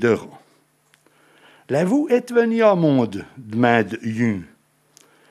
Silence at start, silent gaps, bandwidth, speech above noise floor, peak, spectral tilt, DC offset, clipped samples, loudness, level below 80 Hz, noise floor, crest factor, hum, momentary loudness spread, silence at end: 0 s; none; 13 kHz; 41 dB; -2 dBFS; -7 dB/octave; under 0.1%; under 0.1%; -19 LUFS; -68 dBFS; -60 dBFS; 20 dB; none; 10 LU; 0.85 s